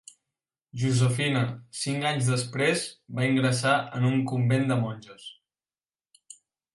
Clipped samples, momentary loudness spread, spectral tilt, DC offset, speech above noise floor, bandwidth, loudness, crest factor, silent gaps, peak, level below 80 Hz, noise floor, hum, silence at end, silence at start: under 0.1%; 12 LU; -5.5 dB/octave; under 0.1%; over 64 dB; 11.5 kHz; -26 LUFS; 18 dB; none; -10 dBFS; -64 dBFS; under -90 dBFS; none; 1.4 s; 0.75 s